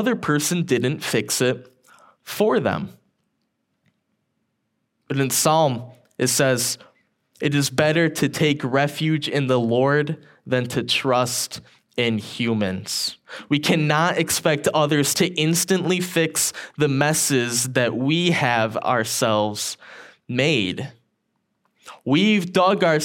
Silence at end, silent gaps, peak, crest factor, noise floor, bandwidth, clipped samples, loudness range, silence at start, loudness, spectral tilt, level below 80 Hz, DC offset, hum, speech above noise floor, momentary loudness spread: 0 s; none; 0 dBFS; 22 dB; -74 dBFS; 17 kHz; under 0.1%; 5 LU; 0 s; -21 LUFS; -4 dB/octave; -66 dBFS; under 0.1%; none; 53 dB; 10 LU